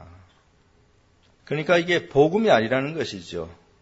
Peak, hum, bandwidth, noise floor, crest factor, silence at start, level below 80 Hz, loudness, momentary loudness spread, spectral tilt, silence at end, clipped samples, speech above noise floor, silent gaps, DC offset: -4 dBFS; none; 8 kHz; -59 dBFS; 20 dB; 0 s; -56 dBFS; -22 LUFS; 15 LU; -5.5 dB/octave; 0.3 s; under 0.1%; 38 dB; none; under 0.1%